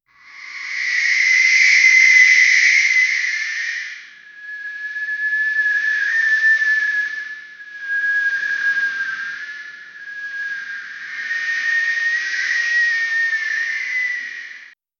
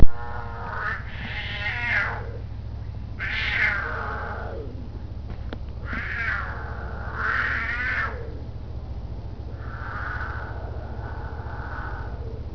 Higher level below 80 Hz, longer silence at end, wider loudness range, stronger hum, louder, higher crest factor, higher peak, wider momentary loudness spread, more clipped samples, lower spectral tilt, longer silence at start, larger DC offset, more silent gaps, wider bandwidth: second, -80 dBFS vs -34 dBFS; first, 0.3 s vs 0 s; first, 10 LU vs 7 LU; neither; first, -15 LUFS vs -29 LUFS; second, 18 dB vs 24 dB; about the same, 0 dBFS vs 0 dBFS; first, 21 LU vs 13 LU; neither; second, 4 dB/octave vs -6.5 dB/octave; first, 0.3 s vs 0 s; neither; neither; first, 7.6 kHz vs 5.4 kHz